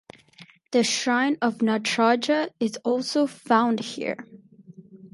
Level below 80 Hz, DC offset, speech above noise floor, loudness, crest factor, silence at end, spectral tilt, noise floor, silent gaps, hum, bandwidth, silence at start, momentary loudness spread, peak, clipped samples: -76 dBFS; under 0.1%; 29 dB; -24 LUFS; 18 dB; 0.05 s; -3.5 dB/octave; -52 dBFS; none; none; 11.5 kHz; 0.4 s; 7 LU; -6 dBFS; under 0.1%